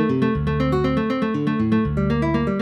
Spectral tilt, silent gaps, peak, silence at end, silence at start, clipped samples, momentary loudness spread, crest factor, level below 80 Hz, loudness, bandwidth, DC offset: -8.5 dB/octave; none; -8 dBFS; 0 s; 0 s; under 0.1%; 2 LU; 12 dB; -34 dBFS; -21 LUFS; 8 kHz; under 0.1%